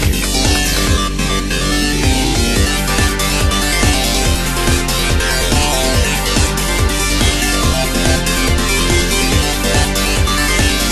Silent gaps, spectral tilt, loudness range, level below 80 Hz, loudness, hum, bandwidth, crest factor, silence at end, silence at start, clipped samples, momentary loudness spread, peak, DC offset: none; -3.5 dB/octave; 1 LU; -18 dBFS; -14 LUFS; none; 13 kHz; 14 dB; 0 s; 0 s; under 0.1%; 2 LU; 0 dBFS; under 0.1%